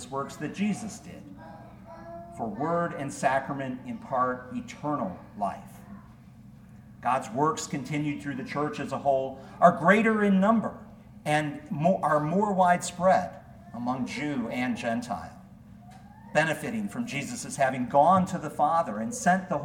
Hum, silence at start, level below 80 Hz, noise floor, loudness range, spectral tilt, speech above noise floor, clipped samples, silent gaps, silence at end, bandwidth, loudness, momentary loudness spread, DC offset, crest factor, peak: none; 0 s; -60 dBFS; -50 dBFS; 8 LU; -5.5 dB/octave; 23 dB; under 0.1%; none; 0 s; 16.5 kHz; -27 LUFS; 21 LU; under 0.1%; 22 dB; -6 dBFS